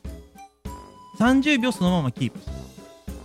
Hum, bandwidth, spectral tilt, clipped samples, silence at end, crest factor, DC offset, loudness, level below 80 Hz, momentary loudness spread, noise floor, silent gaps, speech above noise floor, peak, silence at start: none; 15.5 kHz; -6 dB/octave; under 0.1%; 0 s; 18 dB; under 0.1%; -22 LUFS; -42 dBFS; 23 LU; -46 dBFS; none; 25 dB; -8 dBFS; 0.05 s